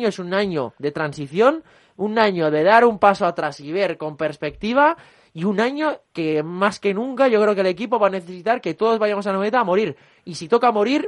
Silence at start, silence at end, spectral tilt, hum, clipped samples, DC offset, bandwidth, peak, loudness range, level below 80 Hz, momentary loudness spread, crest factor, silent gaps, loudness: 0 s; 0 s; -6 dB/octave; none; under 0.1%; under 0.1%; 11 kHz; 0 dBFS; 3 LU; -60 dBFS; 10 LU; 18 dB; none; -20 LUFS